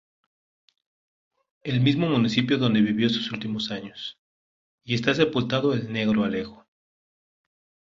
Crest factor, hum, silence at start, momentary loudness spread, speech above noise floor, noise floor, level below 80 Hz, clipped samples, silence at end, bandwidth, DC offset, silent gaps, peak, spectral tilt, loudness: 20 dB; none; 1.65 s; 13 LU; over 66 dB; under -90 dBFS; -60 dBFS; under 0.1%; 1.4 s; 7.6 kHz; under 0.1%; 4.18-4.78 s; -6 dBFS; -6.5 dB/octave; -24 LUFS